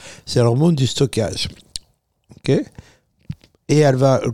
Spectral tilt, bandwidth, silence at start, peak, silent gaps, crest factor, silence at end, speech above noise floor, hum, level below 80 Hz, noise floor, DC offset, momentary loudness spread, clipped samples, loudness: -6 dB/octave; 13.5 kHz; 0.05 s; -4 dBFS; none; 16 dB; 0 s; 43 dB; none; -48 dBFS; -60 dBFS; under 0.1%; 20 LU; under 0.1%; -18 LUFS